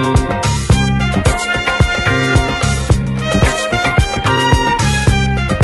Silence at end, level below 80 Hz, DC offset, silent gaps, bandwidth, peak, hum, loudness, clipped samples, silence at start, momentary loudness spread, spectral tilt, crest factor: 0 s; -20 dBFS; under 0.1%; none; 12 kHz; 0 dBFS; none; -14 LUFS; under 0.1%; 0 s; 3 LU; -5 dB/octave; 14 dB